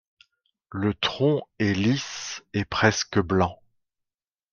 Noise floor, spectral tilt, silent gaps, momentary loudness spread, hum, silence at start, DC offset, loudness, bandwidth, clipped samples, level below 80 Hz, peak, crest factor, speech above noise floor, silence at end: under -90 dBFS; -5 dB/octave; none; 9 LU; none; 0.7 s; under 0.1%; -25 LUFS; 7.2 kHz; under 0.1%; -56 dBFS; -4 dBFS; 22 dB; over 66 dB; 1 s